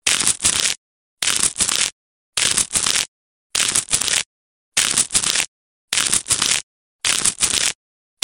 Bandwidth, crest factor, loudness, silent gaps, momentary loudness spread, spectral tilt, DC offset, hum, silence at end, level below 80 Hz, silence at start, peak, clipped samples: over 20 kHz; 22 dB; -17 LUFS; 0.77-1.17 s, 1.92-2.33 s, 3.08-3.50 s, 4.26-4.72 s, 5.48-5.88 s, 6.63-6.99 s; 7 LU; 1 dB/octave; under 0.1%; none; 0.5 s; -48 dBFS; 0.05 s; 0 dBFS; under 0.1%